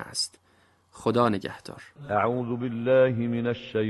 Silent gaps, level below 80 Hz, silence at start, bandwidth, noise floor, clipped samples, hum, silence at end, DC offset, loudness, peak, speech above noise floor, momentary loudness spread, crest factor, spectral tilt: none; -60 dBFS; 0 s; 12 kHz; -63 dBFS; under 0.1%; none; 0 s; under 0.1%; -26 LUFS; -8 dBFS; 37 dB; 16 LU; 18 dB; -5.5 dB/octave